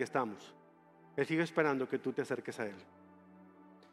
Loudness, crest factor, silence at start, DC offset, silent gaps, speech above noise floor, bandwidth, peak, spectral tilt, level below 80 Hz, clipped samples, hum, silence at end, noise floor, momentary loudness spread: -36 LUFS; 24 dB; 0 s; under 0.1%; none; 26 dB; 13 kHz; -14 dBFS; -6 dB/octave; -86 dBFS; under 0.1%; none; 0.2 s; -62 dBFS; 17 LU